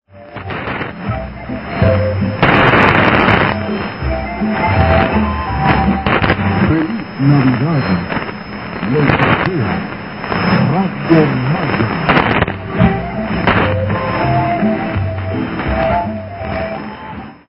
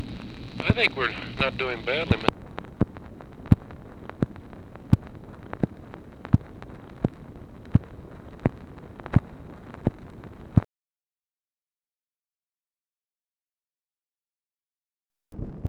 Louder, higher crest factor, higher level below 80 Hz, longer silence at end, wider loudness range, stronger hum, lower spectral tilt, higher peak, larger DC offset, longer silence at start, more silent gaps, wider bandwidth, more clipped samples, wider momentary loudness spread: first, -14 LUFS vs -27 LUFS; second, 14 dB vs 28 dB; first, -28 dBFS vs -42 dBFS; about the same, 0.1 s vs 0 s; second, 3 LU vs 7 LU; neither; first, -9 dB/octave vs -7.5 dB/octave; about the same, 0 dBFS vs 0 dBFS; first, 0.3% vs under 0.1%; first, 0.15 s vs 0 s; second, none vs 11.78-11.82 s; second, 5.8 kHz vs 10 kHz; neither; second, 12 LU vs 20 LU